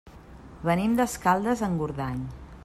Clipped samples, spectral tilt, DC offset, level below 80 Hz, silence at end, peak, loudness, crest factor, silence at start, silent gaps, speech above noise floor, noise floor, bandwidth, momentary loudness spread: under 0.1%; -6 dB/octave; under 0.1%; -48 dBFS; 0 s; -10 dBFS; -26 LUFS; 18 dB; 0.05 s; none; 21 dB; -46 dBFS; 15 kHz; 9 LU